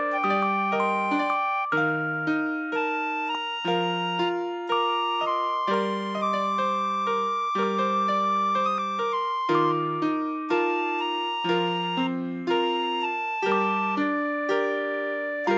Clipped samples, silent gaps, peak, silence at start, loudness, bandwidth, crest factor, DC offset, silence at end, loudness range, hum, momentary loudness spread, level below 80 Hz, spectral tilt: under 0.1%; none; -12 dBFS; 0 s; -25 LUFS; 8 kHz; 14 dB; under 0.1%; 0 s; 1 LU; none; 4 LU; -84 dBFS; -5.5 dB/octave